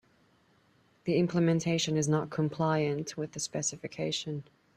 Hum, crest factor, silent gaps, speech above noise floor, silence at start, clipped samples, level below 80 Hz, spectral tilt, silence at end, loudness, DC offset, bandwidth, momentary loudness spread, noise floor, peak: none; 16 dB; none; 36 dB; 1.05 s; under 0.1%; -68 dBFS; -5 dB/octave; 0.35 s; -31 LUFS; under 0.1%; 12.5 kHz; 9 LU; -67 dBFS; -16 dBFS